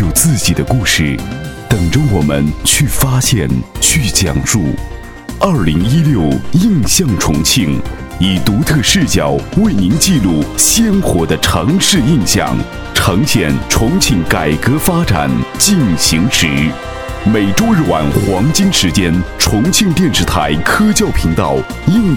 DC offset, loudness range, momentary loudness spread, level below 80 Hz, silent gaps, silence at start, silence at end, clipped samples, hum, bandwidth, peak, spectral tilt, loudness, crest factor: under 0.1%; 2 LU; 6 LU; -26 dBFS; none; 0 s; 0 s; under 0.1%; none; 19.5 kHz; 0 dBFS; -4 dB/octave; -12 LUFS; 12 dB